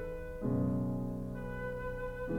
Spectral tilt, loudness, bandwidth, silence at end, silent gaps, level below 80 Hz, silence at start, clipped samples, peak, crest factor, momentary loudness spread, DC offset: -9.5 dB/octave; -37 LUFS; 16.5 kHz; 0 s; none; -46 dBFS; 0 s; under 0.1%; -22 dBFS; 14 dB; 8 LU; under 0.1%